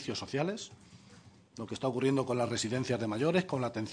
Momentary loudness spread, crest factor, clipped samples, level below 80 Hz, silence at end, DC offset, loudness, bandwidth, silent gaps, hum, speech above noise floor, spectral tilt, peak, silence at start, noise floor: 13 LU; 18 dB; under 0.1%; -70 dBFS; 0 s; under 0.1%; -33 LUFS; 10 kHz; none; none; 25 dB; -5.5 dB/octave; -16 dBFS; 0 s; -57 dBFS